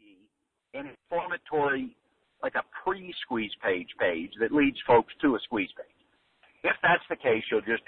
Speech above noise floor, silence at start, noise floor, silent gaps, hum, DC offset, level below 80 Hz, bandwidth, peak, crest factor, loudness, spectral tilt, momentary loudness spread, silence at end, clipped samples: 45 dB; 0.75 s; -73 dBFS; none; none; under 0.1%; -60 dBFS; 4.5 kHz; -10 dBFS; 20 dB; -28 LUFS; -8.5 dB/octave; 13 LU; 0.1 s; under 0.1%